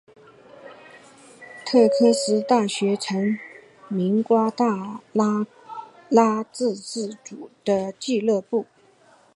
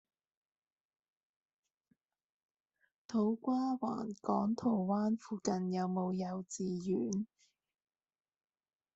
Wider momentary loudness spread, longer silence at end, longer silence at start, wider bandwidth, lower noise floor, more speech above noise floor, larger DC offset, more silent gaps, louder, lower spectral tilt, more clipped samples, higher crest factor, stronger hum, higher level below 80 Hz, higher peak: first, 19 LU vs 6 LU; second, 0.7 s vs 1.7 s; second, 0.65 s vs 3.1 s; first, 11.5 kHz vs 8.2 kHz; second, -56 dBFS vs -79 dBFS; second, 34 dB vs 44 dB; neither; neither; first, -22 LUFS vs -36 LUFS; second, -5.5 dB/octave vs -7 dB/octave; neither; about the same, 20 dB vs 20 dB; neither; about the same, -74 dBFS vs -78 dBFS; first, -4 dBFS vs -18 dBFS